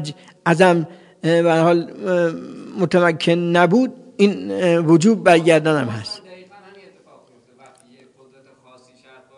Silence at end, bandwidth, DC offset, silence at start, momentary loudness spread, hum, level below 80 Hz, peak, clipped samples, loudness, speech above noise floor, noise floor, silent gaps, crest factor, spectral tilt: 3 s; 11 kHz; under 0.1%; 0 s; 15 LU; none; -66 dBFS; 0 dBFS; under 0.1%; -17 LUFS; 35 dB; -51 dBFS; none; 18 dB; -6 dB/octave